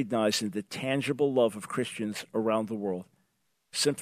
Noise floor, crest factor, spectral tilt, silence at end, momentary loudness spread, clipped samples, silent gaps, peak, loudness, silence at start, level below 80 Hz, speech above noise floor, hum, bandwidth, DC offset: -76 dBFS; 18 dB; -4 dB/octave; 0 s; 8 LU; under 0.1%; none; -12 dBFS; -30 LUFS; 0 s; -78 dBFS; 47 dB; none; 14 kHz; under 0.1%